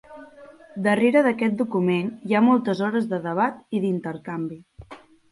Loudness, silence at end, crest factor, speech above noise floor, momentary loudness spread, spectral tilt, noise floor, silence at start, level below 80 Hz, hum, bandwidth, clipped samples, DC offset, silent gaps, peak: -23 LUFS; 0.35 s; 18 dB; 25 dB; 13 LU; -7.5 dB/octave; -47 dBFS; 0.1 s; -62 dBFS; none; 11.5 kHz; under 0.1%; under 0.1%; none; -6 dBFS